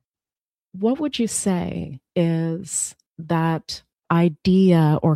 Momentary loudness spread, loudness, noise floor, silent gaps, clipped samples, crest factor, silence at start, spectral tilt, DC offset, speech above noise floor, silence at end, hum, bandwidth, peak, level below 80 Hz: 13 LU; -21 LUFS; under -90 dBFS; 3.07-3.11 s; under 0.1%; 18 dB; 0.75 s; -6 dB/octave; under 0.1%; over 70 dB; 0 s; none; 13 kHz; -4 dBFS; -54 dBFS